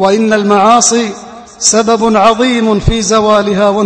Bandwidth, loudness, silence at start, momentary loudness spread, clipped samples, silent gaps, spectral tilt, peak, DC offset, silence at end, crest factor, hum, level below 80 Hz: 11 kHz; -9 LUFS; 0 s; 5 LU; 0.6%; none; -3.5 dB/octave; 0 dBFS; under 0.1%; 0 s; 10 dB; none; -28 dBFS